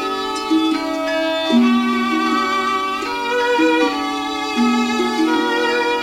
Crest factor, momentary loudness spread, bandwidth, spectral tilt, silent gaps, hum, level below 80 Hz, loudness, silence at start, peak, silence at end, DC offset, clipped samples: 14 dB; 6 LU; 16 kHz; -3 dB/octave; none; none; -54 dBFS; -17 LUFS; 0 s; -4 dBFS; 0 s; under 0.1%; under 0.1%